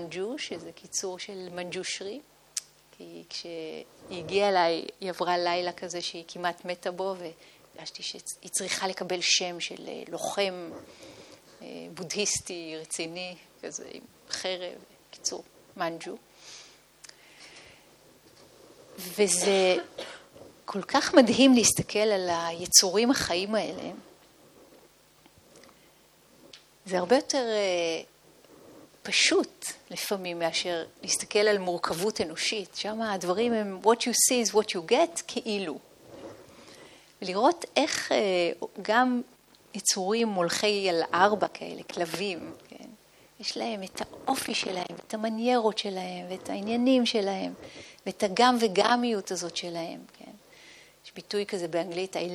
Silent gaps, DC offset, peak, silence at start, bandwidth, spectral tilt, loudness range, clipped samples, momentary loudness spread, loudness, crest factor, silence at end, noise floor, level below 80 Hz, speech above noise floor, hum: none; under 0.1%; -4 dBFS; 0 s; 18.5 kHz; -2.5 dB/octave; 12 LU; under 0.1%; 20 LU; -27 LUFS; 26 dB; 0 s; -59 dBFS; -68 dBFS; 31 dB; none